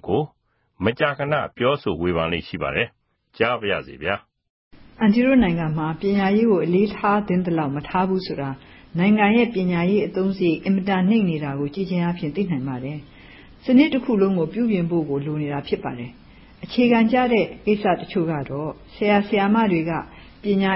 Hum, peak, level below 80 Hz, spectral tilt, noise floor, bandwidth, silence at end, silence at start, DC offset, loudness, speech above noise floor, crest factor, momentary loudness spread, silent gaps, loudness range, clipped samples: none; -4 dBFS; -48 dBFS; -11.5 dB/octave; -65 dBFS; 5.8 kHz; 0 s; 0.05 s; under 0.1%; -21 LUFS; 44 dB; 16 dB; 12 LU; 4.50-4.71 s; 4 LU; under 0.1%